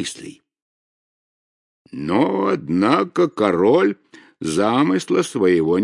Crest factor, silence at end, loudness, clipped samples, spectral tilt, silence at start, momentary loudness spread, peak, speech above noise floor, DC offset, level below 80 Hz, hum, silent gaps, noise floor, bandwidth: 18 dB; 0 s; -18 LUFS; under 0.1%; -5.5 dB/octave; 0 s; 14 LU; 0 dBFS; over 72 dB; under 0.1%; -62 dBFS; none; 0.62-1.85 s; under -90 dBFS; 11.5 kHz